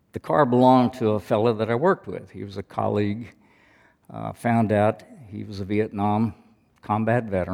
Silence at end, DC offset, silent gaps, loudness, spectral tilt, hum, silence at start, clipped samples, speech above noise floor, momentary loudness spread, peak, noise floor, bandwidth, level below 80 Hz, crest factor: 0 s; under 0.1%; none; -22 LUFS; -8 dB/octave; none; 0.15 s; under 0.1%; 35 dB; 18 LU; -4 dBFS; -58 dBFS; 13 kHz; -60 dBFS; 20 dB